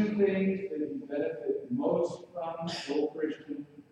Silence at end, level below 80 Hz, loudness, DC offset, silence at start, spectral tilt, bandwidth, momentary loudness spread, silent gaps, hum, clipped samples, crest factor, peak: 0.1 s; -74 dBFS; -32 LUFS; under 0.1%; 0 s; -6.5 dB/octave; 10.5 kHz; 11 LU; none; none; under 0.1%; 16 dB; -16 dBFS